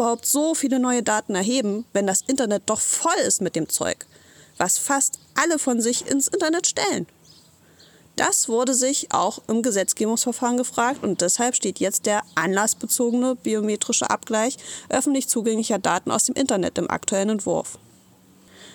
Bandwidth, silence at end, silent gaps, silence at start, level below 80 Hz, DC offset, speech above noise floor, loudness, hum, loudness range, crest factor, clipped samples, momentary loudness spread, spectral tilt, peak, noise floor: 19 kHz; 0 s; none; 0 s; -66 dBFS; under 0.1%; 31 dB; -21 LUFS; none; 1 LU; 18 dB; under 0.1%; 5 LU; -2.5 dB/octave; -4 dBFS; -53 dBFS